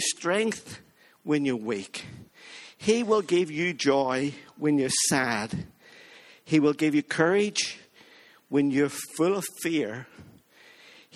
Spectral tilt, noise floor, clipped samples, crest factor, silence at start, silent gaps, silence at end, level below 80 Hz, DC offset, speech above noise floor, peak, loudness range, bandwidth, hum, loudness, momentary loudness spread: -4 dB/octave; -55 dBFS; under 0.1%; 20 dB; 0 s; none; 0.9 s; -66 dBFS; under 0.1%; 29 dB; -8 dBFS; 4 LU; 14.5 kHz; none; -26 LUFS; 19 LU